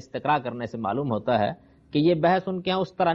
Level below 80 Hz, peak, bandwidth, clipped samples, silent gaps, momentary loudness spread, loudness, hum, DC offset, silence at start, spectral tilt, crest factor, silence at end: -60 dBFS; -8 dBFS; 7.4 kHz; under 0.1%; none; 8 LU; -25 LUFS; none; under 0.1%; 0.15 s; -8 dB/octave; 16 dB; 0 s